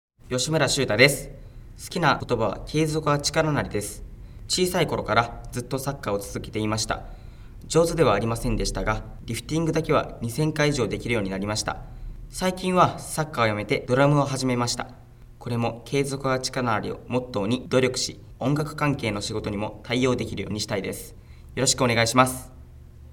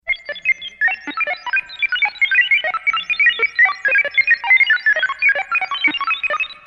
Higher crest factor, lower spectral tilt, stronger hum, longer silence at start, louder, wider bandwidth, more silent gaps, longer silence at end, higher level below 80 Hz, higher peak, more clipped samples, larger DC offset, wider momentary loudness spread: first, 24 dB vs 12 dB; first, -4.5 dB/octave vs -1 dB/octave; neither; first, 0.25 s vs 0.05 s; second, -24 LUFS vs -15 LUFS; first, 18.5 kHz vs 8 kHz; neither; about the same, 0 s vs 0.1 s; first, -42 dBFS vs -58 dBFS; about the same, -2 dBFS vs -4 dBFS; neither; neither; first, 12 LU vs 8 LU